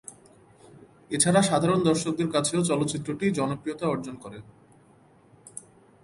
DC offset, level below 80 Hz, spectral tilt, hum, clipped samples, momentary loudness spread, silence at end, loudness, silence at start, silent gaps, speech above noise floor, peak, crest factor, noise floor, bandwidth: under 0.1%; -62 dBFS; -4.5 dB/octave; none; under 0.1%; 22 LU; 0.45 s; -25 LUFS; 0.1 s; none; 32 dB; -6 dBFS; 20 dB; -57 dBFS; 11.5 kHz